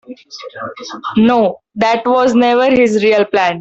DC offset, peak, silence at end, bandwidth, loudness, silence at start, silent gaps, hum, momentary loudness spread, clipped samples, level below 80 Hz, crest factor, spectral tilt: under 0.1%; -2 dBFS; 0 s; 8 kHz; -12 LUFS; 0.1 s; none; none; 16 LU; under 0.1%; -52 dBFS; 10 dB; -5.5 dB/octave